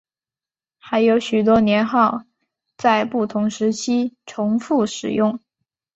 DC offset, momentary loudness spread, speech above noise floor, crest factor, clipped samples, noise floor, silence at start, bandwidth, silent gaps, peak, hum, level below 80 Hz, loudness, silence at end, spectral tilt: under 0.1%; 7 LU; over 72 dB; 18 dB; under 0.1%; under -90 dBFS; 0.85 s; 8 kHz; none; -2 dBFS; none; -56 dBFS; -19 LUFS; 0.6 s; -5.5 dB/octave